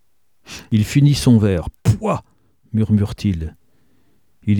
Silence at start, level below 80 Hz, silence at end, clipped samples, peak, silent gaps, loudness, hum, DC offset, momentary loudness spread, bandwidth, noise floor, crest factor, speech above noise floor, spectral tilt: 0.5 s; -38 dBFS; 0 s; under 0.1%; -2 dBFS; none; -18 LUFS; none; 0.2%; 14 LU; 17 kHz; -62 dBFS; 16 dB; 46 dB; -7 dB/octave